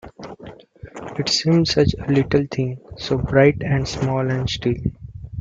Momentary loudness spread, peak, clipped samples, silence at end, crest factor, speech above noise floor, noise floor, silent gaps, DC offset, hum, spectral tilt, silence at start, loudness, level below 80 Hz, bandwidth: 21 LU; -2 dBFS; under 0.1%; 0 s; 18 dB; 22 dB; -41 dBFS; none; under 0.1%; none; -6 dB/octave; 0.05 s; -20 LUFS; -40 dBFS; 7.8 kHz